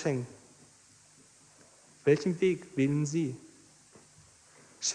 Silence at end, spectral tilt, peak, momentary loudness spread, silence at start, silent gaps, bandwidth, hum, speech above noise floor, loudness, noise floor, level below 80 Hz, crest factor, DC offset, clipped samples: 0 s; -5 dB/octave; -12 dBFS; 10 LU; 0 s; none; 10.5 kHz; none; 31 dB; -30 LUFS; -60 dBFS; -70 dBFS; 20 dB; under 0.1%; under 0.1%